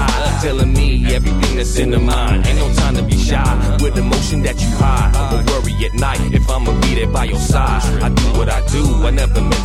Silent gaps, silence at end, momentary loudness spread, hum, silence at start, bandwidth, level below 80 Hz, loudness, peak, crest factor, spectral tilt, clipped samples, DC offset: none; 0 s; 2 LU; none; 0 s; 14 kHz; -16 dBFS; -16 LUFS; 0 dBFS; 12 dB; -5.5 dB/octave; under 0.1%; under 0.1%